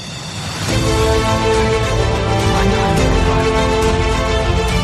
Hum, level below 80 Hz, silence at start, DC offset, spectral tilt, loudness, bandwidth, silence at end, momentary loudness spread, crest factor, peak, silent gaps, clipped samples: none; -22 dBFS; 0 s; under 0.1%; -5 dB/octave; -15 LUFS; 14.5 kHz; 0 s; 4 LU; 12 dB; -2 dBFS; none; under 0.1%